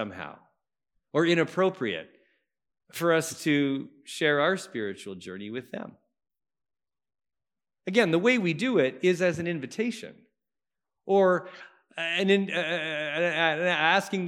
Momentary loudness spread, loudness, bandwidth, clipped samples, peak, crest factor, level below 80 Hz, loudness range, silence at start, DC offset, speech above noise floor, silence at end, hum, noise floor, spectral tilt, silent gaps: 17 LU; -26 LUFS; 16 kHz; under 0.1%; -6 dBFS; 22 dB; -78 dBFS; 5 LU; 0 s; under 0.1%; over 63 dB; 0 s; none; under -90 dBFS; -5 dB/octave; none